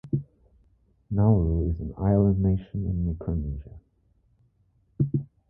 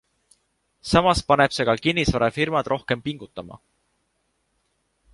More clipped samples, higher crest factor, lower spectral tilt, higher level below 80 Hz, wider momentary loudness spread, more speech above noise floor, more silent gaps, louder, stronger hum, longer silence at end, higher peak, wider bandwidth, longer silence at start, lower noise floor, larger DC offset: neither; about the same, 18 dB vs 22 dB; first, -14 dB/octave vs -5 dB/octave; first, -36 dBFS vs -42 dBFS; second, 10 LU vs 18 LU; second, 42 dB vs 50 dB; neither; second, -26 LUFS vs -21 LUFS; neither; second, 0.25 s vs 1.55 s; second, -8 dBFS vs -2 dBFS; second, 2.1 kHz vs 11.5 kHz; second, 0.05 s vs 0.85 s; second, -66 dBFS vs -72 dBFS; neither